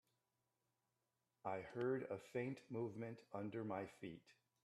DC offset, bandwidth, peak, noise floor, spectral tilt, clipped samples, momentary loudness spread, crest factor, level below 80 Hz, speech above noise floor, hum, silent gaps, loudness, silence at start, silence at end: under 0.1%; 12.5 kHz; -30 dBFS; -90 dBFS; -7.5 dB/octave; under 0.1%; 9 LU; 18 dB; -86 dBFS; 42 dB; none; none; -48 LUFS; 1.45 s; 0.3 s